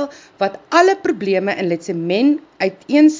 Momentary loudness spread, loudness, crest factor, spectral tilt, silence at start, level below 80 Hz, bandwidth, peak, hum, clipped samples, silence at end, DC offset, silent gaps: 9 LU; -17 LUFS; 16 dB; -5.5 dB/octave; 0 s; -66 dBFS; 7.6 kHz; 0 dBFS; none; under 0.1%; 0 s; under 0.1%; none